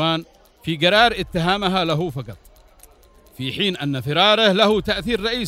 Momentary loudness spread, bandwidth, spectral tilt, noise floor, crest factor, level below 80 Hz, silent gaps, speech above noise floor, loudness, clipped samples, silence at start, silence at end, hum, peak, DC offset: 14 LU; 16 kHz; -5 dB/octave; -50 dBFS; 20 dB; -44 dBFS; none; 31 dB; -18 LUFS; under 0.1%; 0 s; 0 s; none; -2 dBFS; under 0.1%